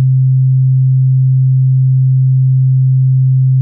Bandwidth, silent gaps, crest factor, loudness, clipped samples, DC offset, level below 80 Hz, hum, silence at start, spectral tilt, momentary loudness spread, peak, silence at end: 0.2 kHz; none; 4 dB; -10 LUFS; under 0.1%; under 0.1%; -68 dBFS; none; 0 s; -31 dB/octave; 0 LU; -6 dBFS; 0 s